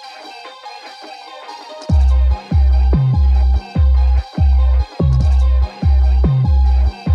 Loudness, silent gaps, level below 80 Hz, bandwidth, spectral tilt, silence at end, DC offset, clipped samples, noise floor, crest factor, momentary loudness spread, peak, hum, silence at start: -15 LUFS; none; -14 dBFS; 5.8 kHz; -8.5 dB/octave; 0 s; under 0.1%; under 0.1%; -34 dBFS; 10 dB; 19 LU; -4 dBFS; none; 0 s